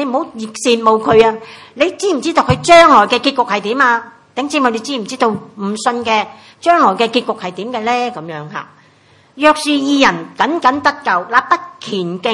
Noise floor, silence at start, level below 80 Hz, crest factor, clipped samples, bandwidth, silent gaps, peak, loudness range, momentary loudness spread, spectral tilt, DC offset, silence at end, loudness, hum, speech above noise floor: -49 dBFS; 0 s; -50 dBFS; 14 dB; 0.3%; 12 kHz; none; 0 dBFS; 5 LU; 13 LU; -4 dB/octave; under 0.1%; 0 s; -13 LUFS; none; 35 dB